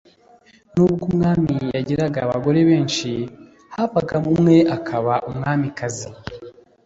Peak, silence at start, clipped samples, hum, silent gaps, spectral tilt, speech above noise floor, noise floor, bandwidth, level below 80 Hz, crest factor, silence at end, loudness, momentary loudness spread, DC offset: -2 dBFS; 0.75 s; under 0.1%; none; none; -6.5 dB/octave; 33 dB; -52 dBFS; 8 kHz; -50 dBFS; 16 dB; 0.35 s; -19 LUFS; 16 LU; under 0.1%